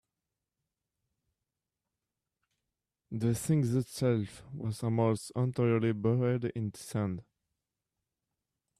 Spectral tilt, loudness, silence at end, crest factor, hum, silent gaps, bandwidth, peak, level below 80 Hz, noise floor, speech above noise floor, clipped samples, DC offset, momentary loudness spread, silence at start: -7 dB/octave; -32 LUFS; 1.6 s; 16 dB; none; none; 14 kHz; -18 dBFS; -66 dBFS; -89 dBFS; 58 dB; under 0.1%; under 0.1%; 10 LU; 3.1 s